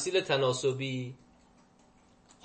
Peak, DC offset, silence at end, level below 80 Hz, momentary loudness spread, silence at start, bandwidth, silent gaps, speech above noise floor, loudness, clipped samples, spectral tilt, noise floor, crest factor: -14 dBFS; under 0.1%; 1.3 s; -70 dBFS; 11 LU; 0 s; 8.8 kHz; none; 32 dB; -30 LUFS; under 0.1%; -4 dB/octave; -62 dBFS; 20 dB